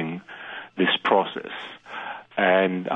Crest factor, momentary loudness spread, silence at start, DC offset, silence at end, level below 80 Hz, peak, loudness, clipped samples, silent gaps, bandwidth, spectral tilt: 20 dB; 16 LU; 0 s; under 0.1%; 0 s; -74 dBFS; -4 dBFS; -23 LUFS; under 0.1%; none; 7.6 kHz; -7 dB/octave